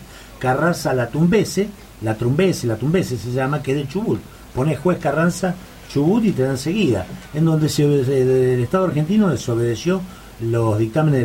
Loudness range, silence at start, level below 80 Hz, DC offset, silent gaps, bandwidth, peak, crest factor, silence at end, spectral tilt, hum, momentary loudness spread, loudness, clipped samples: 3 LU; 0 s; -44 dBFS; under 0.1%; none; 16.5 kHz; -4 dBFS; 14 dB; 0 s; -6.5 dB/octave; none; 8 LU; -19 LUFS; under 0.1%